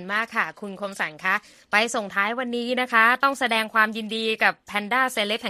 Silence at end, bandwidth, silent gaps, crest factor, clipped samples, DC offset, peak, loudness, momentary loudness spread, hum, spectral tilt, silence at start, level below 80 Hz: 0 s; 15 kHz; none; 20 dB; under 0.1%; under 0.1%; -4 dBFS; -22 LUFS; 10 LU; none; -2.5 dB/octave; 0 s; -70 dBFS